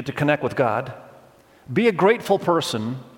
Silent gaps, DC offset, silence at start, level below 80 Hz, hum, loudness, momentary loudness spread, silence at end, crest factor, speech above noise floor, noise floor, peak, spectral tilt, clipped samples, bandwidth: none; under 0.1%; 0 s; -60 dBFS; none; -21 LUFS; 10 LU; 0.1 s; 18 dB; 30 dB; -51 dBFS; -4 dBFS; -5.5 dB/octave; under 0.1%; 17 kHz